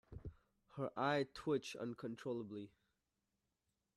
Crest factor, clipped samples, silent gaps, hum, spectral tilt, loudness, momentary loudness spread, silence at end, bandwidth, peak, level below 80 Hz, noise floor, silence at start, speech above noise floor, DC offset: 22 dB; under 0.1%; none; none; -6 dB/octave; -43 LUFS; 18 LU; 1.3 s; 13 kHz; -24 dBFS; -70 dBFS; -88 dBFS; 0.1 s; 46 dB; under 0.1%